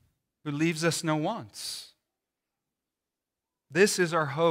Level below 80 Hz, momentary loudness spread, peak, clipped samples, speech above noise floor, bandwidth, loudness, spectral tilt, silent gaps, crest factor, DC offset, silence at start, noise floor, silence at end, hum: -78 dBFS; 13 LU; -10 dBFS; under 0.1%; 61 dB; 16 kHz; -28 LUFS; -4.5 dB/octave; none; 20 dB; under 0.1%; 0.45 s; -89 dBFS; 0 s; none